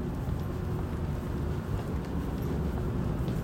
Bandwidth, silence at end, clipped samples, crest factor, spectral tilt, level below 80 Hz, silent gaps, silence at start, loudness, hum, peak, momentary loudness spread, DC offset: 16 kHz; 0 s; under 0.1%; 12 dB; -8 dB/octave; -38 dBFS; none; 0 s; -33 LUFS; none; -18 dBFS; 2 LU; under 0.1%